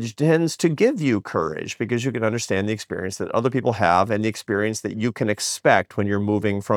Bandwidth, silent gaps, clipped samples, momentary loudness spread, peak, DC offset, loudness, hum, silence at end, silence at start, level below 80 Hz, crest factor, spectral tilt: 18 kHz; none; under 0.1%; 7 LU; -2 dBFS; under 0.1%; -22 LUFS; none; 0 s; 0 s; -64 dBFS; 20 dB; -5.5 dB/octave